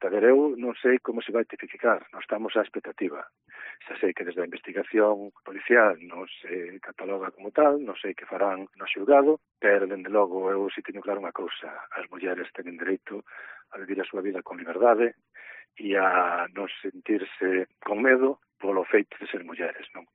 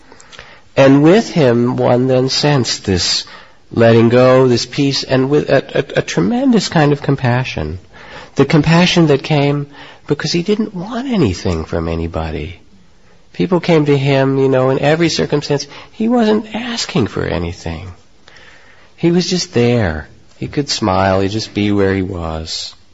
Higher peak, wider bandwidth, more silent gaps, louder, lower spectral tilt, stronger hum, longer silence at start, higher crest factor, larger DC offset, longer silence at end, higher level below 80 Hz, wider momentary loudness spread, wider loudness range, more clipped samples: second, -6 dBFS vs 0 dBFS; second, 4 kHz vs 8 kHz; neither; second, -26 LUFS vs -14 LUFS; second, -2 dB/octave vs -5.5 dB/octave; neither; second, 0 s vs 0.3 s; first, 20 dB vs 14 dB; second, under 0.1% vs 0.6%; about the same, 0.15 s vs 0.2 s; second, -84 dBFS vs -36 dBFS; first, 18 LU vs 13 LU; about the same, 6 LU vs 6 LU; neither